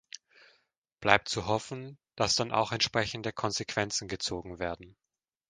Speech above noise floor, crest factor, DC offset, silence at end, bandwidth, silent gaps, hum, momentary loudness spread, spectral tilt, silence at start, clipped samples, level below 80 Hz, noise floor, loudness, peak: 42 dB; 30 dB; under 0.1%; 0.6 s; 11 kHz; none; none; 17 LU; -3 dB/octave; 1 s; under 0.1%; -58 dBFS; -73 dBFS; -30 LUFS; -2 dBFS